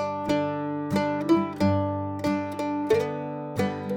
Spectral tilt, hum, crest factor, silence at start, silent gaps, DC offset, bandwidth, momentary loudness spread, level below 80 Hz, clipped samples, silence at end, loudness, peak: -7 dB/octave; none; 16 dB; 0 s; none; under 0.1%; 17.5 kHz; 6 LU; -60 dBFS; under 0.1%; 0 s; -27 LUFS; -10 dBFS